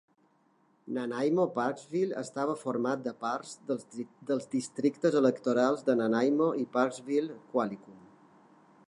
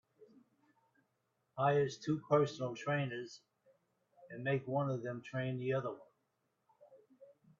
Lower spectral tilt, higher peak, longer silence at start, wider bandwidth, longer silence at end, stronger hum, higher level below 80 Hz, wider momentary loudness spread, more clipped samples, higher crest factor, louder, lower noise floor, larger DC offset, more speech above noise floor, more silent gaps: about the same, -6 dB/octave vs -6 dB/octave; first, -12 dBFS vs -18 dBFS; first, 0.85 s vs 0.2 s; first, 11 kHz vs 7.4 kHz; first, 0.9 s vs 0.35 s; neither; about the same, -84 dBFS vs -80 dBFS; second, 10 LU vs 18 LU; neither; about the same, 20 dB vs 22 dB; first, -31 LUFS vs -37 LUFS; second, -68 dBFS vs -83 dBFS; neither; second, 38 dB vs 46 dB; neither